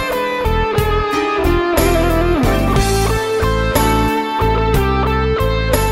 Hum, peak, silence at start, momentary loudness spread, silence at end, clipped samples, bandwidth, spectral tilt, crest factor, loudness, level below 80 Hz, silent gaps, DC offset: none; -2 dBFS; 0 s; 2 LU; 0 s; under 0.1%; 16.5 kHz; -5.5 dB/octave; 14 dB; -15 LUFS; -20 dBFS; none; under 0.1%